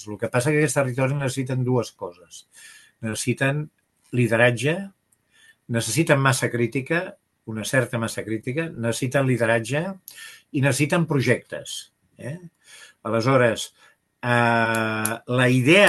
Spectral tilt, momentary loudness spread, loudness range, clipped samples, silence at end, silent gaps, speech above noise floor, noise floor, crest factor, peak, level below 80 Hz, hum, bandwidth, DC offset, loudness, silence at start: -5 dB/octave; 17 LU; 3 LU; under 0.1%; 0 s; none; 37 dB; -60 dBFS; 22 dB; -2 dBFS; -62 dBFS; none; 12.5 kHz; under 0.1%; -22 LUFS; 0 s